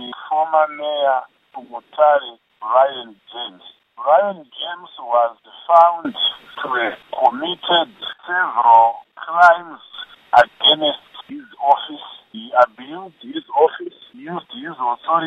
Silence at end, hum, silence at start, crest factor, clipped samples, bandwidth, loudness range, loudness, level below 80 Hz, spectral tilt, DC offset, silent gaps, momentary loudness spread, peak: 0 s; none; 0 s; 18 dB; under 0.1%; 8.2 kHz; 5 LU; -17 LUFS; -66 dBFS; -4 dB/octave; under 0.1%; none; 22 LU; 0 dBFS